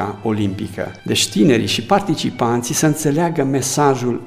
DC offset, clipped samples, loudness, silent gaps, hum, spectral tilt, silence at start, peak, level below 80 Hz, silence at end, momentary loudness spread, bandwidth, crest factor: under 0.1%; under 0.1%; -17 LUFS; none; none; -4.5 dB/octave; 0 s; -2 dBFS; -52 dBFS; 0 s; 7 LU; 16 kHz; 16 dB